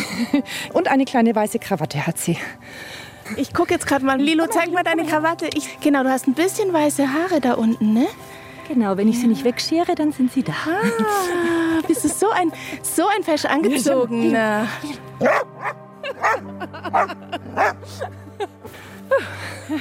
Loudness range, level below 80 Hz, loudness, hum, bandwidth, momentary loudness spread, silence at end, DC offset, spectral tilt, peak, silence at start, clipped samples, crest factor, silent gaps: 4 LU; -58 dBFS; -20 LUFS; none; 16.5 kHz; 14 LU; 0 s; under 0.1%; -4.5 dB/octave; -4 dBFS; 0 s; under 0.1%; 16 dB; none